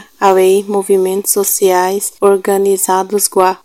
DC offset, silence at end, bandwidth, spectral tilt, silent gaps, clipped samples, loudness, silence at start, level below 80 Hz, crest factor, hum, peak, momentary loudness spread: 0.2%; 0.1 s; 17 kHz; -3.5 dB/octave; none; 0.3%; -12 LUFS; 0 s; -62 dBFS; 12 dB; none; 0 dBFS; 3 LU